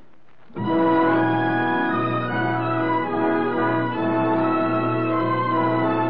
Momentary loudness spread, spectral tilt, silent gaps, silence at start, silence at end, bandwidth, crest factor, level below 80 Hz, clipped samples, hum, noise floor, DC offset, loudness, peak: 4 LU; -10.5 dB/octave; none; 0.55 s; 0 s; 5.2 kHz; 12 dB; -66 dBFS; under 0.1%; none; -55 dBFS; 0.9%; -21 LUFS; -10 dBFS